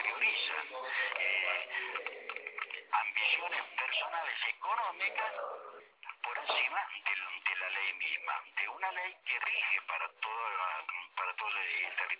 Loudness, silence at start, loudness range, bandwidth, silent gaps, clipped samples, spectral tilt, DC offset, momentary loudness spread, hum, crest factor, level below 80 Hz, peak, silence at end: -34 LUFS; 0 s; 2 LU; 4 kHz; none; under 0.1%; 7 dB/octave; under 0.1%; 10 LU; none; 18 dB; under -90 dBFS; -18 dBFS; 0 s